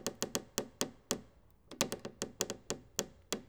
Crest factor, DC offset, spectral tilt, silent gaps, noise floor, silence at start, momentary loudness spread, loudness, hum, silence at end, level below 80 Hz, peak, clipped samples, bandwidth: 32 dB; under 0.1%; -2 dB/octave; none; -63 dBFS; 0 s; 5 LU; -39 LUFS; none; 0 s; -66 dBFS; -10 dBFS; under 0.1%; over 20 kHz